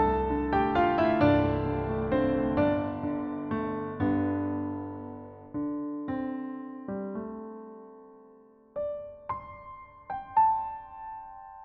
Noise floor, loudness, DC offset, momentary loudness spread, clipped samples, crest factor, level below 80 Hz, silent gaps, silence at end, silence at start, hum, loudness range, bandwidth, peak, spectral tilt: -56 dBFS; -29 LUFS; under 0.1%; 19 LU; under 0.1%; 18 dB; -48 dBFS; none; 0 s; 0 s; none; 12 LU; 5.4 kHz; -12 dBFS; -6.5 dB/octave